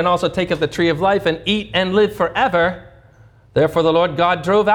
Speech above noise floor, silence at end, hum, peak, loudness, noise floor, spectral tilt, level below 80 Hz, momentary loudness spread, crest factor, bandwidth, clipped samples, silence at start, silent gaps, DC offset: 31 dB; 0 s; none; -4 dBFS; -17 LUFS; -47 dBFS; -6 dB/octave; -46 dBFS; 4 LU; 14 dB; 18 kHz; under 0.1%; 0 s; none; under 0.1%